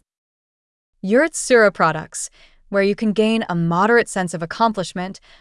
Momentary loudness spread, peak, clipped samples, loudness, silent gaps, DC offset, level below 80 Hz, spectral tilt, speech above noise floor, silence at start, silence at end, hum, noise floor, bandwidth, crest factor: 14 LU; -4 dBFS; under 0.1%; -18 LUFS; none; under 0.1%; -54 dBFS; -5 dB/octave; over 72 dB; 1.05 s; 0.25 s; none; under -90 dBFS; 12 kHz; 16 dB